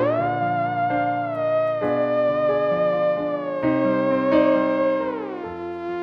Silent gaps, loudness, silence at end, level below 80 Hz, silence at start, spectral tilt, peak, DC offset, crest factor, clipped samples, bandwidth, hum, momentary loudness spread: none; -22 LUFS; 0 s; -58 dBFS; 0 s; -9 dB/octave; -6 dBFS; under 0.1%; 14 dB; under 0.1%; 5.8 kHz; none; 9 LU